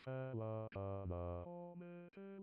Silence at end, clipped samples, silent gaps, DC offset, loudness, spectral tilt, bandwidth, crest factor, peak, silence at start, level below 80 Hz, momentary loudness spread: 0 s; under 0.1%; none; under 0.1%; -48 LUFS; -8.5 dB/octave; 4.9 kHz; 12 dB; -34 dBFS; 0 s; -66 dBFS; 10 LU